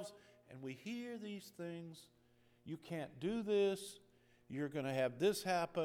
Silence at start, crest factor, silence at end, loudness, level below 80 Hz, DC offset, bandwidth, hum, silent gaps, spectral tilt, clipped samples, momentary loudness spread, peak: 0 s; 18 dB; 0 s; -41 LUFS; -78 dBFS; under 0.1%; 16.5 kHz; none; none; -5 dB/octave; under 0.1%; 18 LU; -24 dBFS